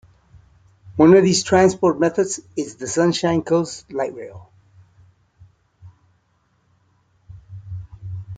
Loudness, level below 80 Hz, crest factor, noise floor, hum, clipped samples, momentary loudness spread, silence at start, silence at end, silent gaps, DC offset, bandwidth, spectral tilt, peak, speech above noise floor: -18 LUFS; -54 dBFS; 20 dB; -64 dBFS; none; under 0.1%; 23 LU; 0.85 s; 0 s; none; under 0.1%; 9.4 kHz; -5 dB/octave; -2 dBFS; 47 dB